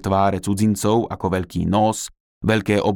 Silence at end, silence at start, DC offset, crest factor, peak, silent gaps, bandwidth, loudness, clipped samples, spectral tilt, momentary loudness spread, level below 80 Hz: 0 s; 0.05 s; under 0.1%; 16 dB; -4 dBFS; 2.20-2.41 s; 17.5 kHz; -20 LUFS; under 0.1%; -6 dB/octave; 6 LU; -44 dBFS